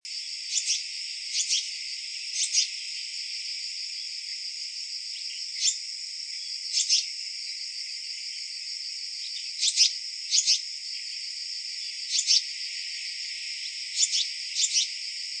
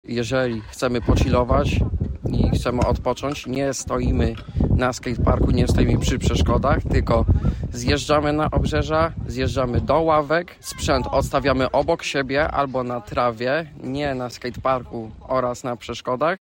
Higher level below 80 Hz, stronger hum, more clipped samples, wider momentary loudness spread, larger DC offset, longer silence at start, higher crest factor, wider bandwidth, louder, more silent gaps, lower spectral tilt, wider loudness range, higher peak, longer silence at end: second, -84 dBFS vs -28 dBFS; neither; neither; first, 10 LU vs 7 LU; neither; about the same, 0.05 s vs 0.1 s; first, 24 dB vs 14 dB; second, 9.8 kHz vs 16.5 kHz; second, -27 LUFS vs -22 LUFS; neither; second, 8.5 dB/octave vs -6 dB/octave; about the same, 4 LU vs 4 LU; about the same, -6 dBFS vs -6 dBFS; about the same, 0 s vs 0.05 s